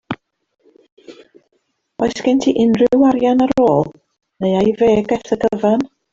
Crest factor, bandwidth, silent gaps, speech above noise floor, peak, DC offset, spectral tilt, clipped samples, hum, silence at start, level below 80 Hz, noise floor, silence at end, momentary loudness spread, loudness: 14 dB; 7.6 kHz; 0.92-0.97 s; 53 dB; -2 dBFS; under 0.1%; -6.5 dB/octave; under 0.1%; none; 0.1 s; -50 dBFS; -67 dBFS; 0.25 s; 9 LU; -15 LUFS